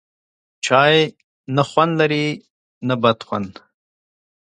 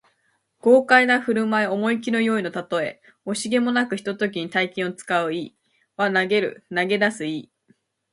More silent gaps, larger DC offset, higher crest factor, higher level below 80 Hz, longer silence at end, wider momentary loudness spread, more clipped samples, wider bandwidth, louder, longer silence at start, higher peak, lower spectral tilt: first, 1.24-1.44 s, 2.50-2.81 s vs none; neither; about the same, 20 dB vs 22 dB; first, -62 dBFS vs -70 dBFS; first, 1.1 s vs 0.7 s; about the same, 13 LU vs 13 LU; neither; second, 9.6 kHz vs 11.5 kHz; first, -18 LUFS vs -22 LUFS; about the same, 0.65 s vs 0.65 s; about the same, 0 dBFS vs -2 dBFS; about the same, -5 dB/octave vs -4.5 dB/octave